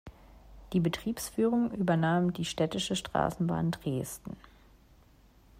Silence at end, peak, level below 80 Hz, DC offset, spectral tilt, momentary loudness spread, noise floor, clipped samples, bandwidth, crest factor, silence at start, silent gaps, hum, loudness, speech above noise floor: 1.25 s; -14 dBFS; -56 dBFS; under 0.1%; -5.5 dB/octave; 8 LU; -60 dBFS; under 0.1%; 16 kHz; 18 dB; 0.05 s; none; none; -31 LUFS; 30 dB